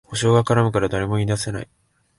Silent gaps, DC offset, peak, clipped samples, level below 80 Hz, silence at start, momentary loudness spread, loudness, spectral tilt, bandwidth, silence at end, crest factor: none; under 0.1%; -4 dBFS; under 0.1%; -44 dBFS; 0.1 s; 13 LU; -20 LUFS; -6 dB/octave; 11.5 kHz; 0.55 s; 16 dB